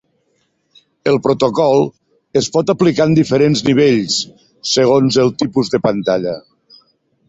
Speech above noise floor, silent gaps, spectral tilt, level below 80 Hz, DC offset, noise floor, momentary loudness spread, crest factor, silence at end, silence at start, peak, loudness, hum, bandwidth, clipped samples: 50 dB; none; -5.5 dB/octave; -52 dBFS; under 0.1%; -63 dBFS; 9 LU; 14 dB; 0.9 s; 1.05 s; -2 dBFS; -14 LUFS; none; 8 kHz; under 0.1%